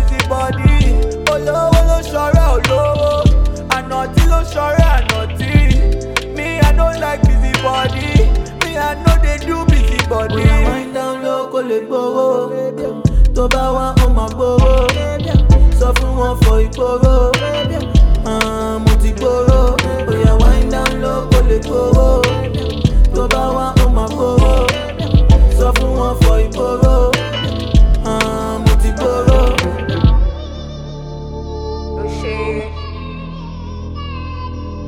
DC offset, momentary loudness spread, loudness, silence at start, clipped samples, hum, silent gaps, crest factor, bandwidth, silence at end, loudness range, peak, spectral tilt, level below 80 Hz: under 0.1%; 10 LU; -14 LUFS; 0 s; under 0.1%; none; none; 12 dB; 14 kHz; 0 s; 3 LU; 0 dBFS; -6 dB/octave; -14 dBFS